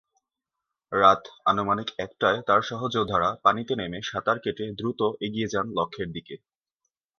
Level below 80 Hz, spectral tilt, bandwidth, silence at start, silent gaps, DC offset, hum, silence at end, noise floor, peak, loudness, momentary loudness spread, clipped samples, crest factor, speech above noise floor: -58 dBFS; -5.5 dB/octave; 7 kHz; 0.9 s; none; under 0.1%; none; 0.85 s; -86 dBFS; -4 dBFS; -25 LUFS; 12 LU; under 0.1%; 22 dB; 61 dB